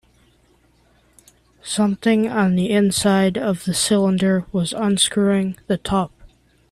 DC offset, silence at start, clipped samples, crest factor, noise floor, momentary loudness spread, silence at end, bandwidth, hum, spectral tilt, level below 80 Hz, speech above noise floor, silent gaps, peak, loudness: under 0.1%; 1.65 s; under 0.1%; 16 dB; -57 dBFS; 7 LU; 0.65 s; 13.5 kHz; none; -4.5 dB/octave; -50 dBFS; 39 dB; none; -4 dBFS; -19 LUFS